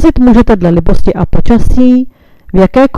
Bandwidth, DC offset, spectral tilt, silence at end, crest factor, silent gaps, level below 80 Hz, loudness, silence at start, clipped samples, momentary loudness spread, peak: 9.4 kHz; under 0.1%; -8.5 dB/octave; 0 s; 6 dB; none; -16 dBFS; -9 LUFS; 0 s; 4%; 7 LU; 0 dBFS